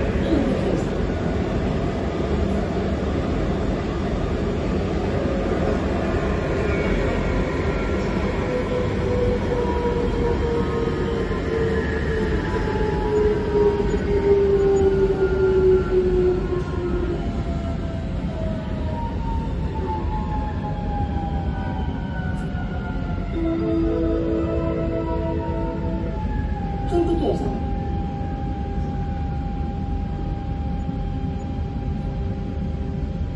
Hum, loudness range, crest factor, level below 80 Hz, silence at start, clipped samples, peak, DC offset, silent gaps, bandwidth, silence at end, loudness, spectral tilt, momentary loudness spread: none; 7 LU; 16 dB; -28 dBFS; 0 s; under 0.1%; -6 dBFS; under 0.1%; none; 11 kHz; 0 s; -23 LUFS; -8 dB/octave; 8 LU